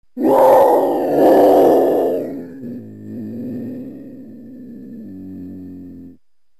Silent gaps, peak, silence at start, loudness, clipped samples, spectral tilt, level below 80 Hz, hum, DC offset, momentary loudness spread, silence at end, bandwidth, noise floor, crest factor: none; -4 dBFS; 0.15 s; -13 LUFS; under 0.1%; -7 dB/octave; -56 dBFS; none; 0.4%; 25 LU; 0.5 s; 15 kHz; -50 dBFS; 14 dB